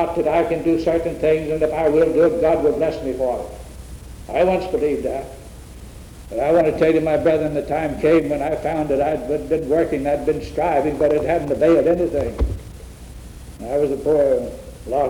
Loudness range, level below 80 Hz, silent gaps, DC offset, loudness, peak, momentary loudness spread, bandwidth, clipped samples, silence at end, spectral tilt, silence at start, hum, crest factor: 4 LU; -36 dBFS; none; under 0.1%; -19 LUFS; -6 dBFS; 22 LU; 19 kHz; under 0.1%; 0 s; -7 dB/octave; 0 s; none; 14 dB